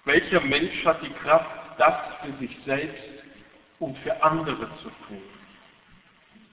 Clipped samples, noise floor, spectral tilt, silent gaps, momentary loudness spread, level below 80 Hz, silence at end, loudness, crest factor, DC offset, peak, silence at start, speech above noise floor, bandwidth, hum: under 0.1%; -56 dBFS; -8.5 dB/octave; none; 20 LU; -58 dBFS; 1.15 s; -25 LUFS; 20 dB; under 0.1%; -6 dBFS; 0.05 s; 31 dB; 4 kHz; none